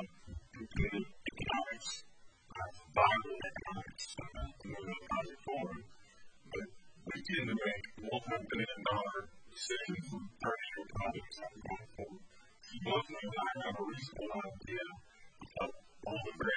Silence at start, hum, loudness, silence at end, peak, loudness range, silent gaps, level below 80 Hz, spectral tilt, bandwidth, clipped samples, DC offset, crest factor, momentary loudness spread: 0 s; none; -40 LUFS; 0 s; -16 dBFS; 6 LU; none; -56 dBFS; -4.5 dB/octave; 9 kHz; under 0.1%; under 0.1%; 26 dB; 13 LU